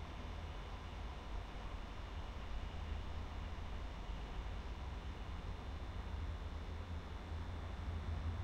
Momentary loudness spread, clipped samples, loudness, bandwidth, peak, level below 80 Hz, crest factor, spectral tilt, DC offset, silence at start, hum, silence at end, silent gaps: 3 LU; under 0.1%; -48 LUFS; 8.8 kHz; -32 dBFS; -48 dBFS; 12 dB; -6.5 dB/octave; under 0.1%; 0 s; none; 0 s; none